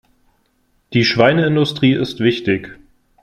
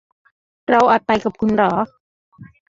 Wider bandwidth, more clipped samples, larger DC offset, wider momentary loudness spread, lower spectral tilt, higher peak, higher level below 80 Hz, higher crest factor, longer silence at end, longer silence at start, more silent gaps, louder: first, 12.5 kHz vs 7.6 kHz; neither; neither; second, 8 LU vs 12 LU; about the same, -6.5 dB/octave vs -6.5 dB/octave; about the same, 0 dBFS vs -2 dBFS; about the same, -52 dBFS vs -52 dBFS; about the same, 16 dB vs 18 dB; first, 0.5 s vs 0.25 s; first, 0.9 s vs 0.7 s; second, none vs 2.00-2.32 s; about the same, -16 LUFS vs -17 LUFS